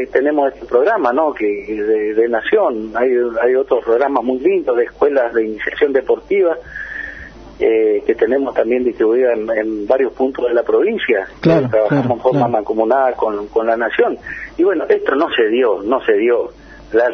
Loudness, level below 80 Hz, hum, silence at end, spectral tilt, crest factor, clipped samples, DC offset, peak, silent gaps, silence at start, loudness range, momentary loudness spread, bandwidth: -16 LUFS; -48 dBFS; none; 0 s; -8 dB/octave; 14 dB; under 0.1%; under 0.1%; 0 dBFS; none; 0 s; 2 LU; 5 LU; 6.2 kHz